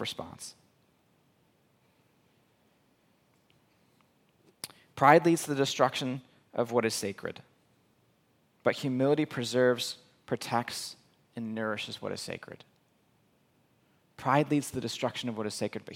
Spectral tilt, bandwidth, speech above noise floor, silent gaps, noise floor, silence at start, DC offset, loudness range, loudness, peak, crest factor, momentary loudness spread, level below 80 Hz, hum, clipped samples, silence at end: -4.5 dB/octave; 17 kHz; 40 dB; none; -69 dBFS; 0 s; under 0.1%; 9 LU; -30 LUFS; -6 dBFS; 26 dB; 18 LU; -74 dBFS; none; under 0.1%; 0 s